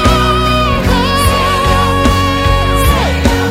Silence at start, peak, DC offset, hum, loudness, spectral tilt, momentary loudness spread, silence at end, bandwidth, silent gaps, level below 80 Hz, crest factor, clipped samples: 0 s; 0 dBFS; under 0.1%; none; -11 LUFS; -5 dB/octave; 1 LU; 0 s; 16.5 kHz; none; -16 dBFS; 10 dB; under 0.1%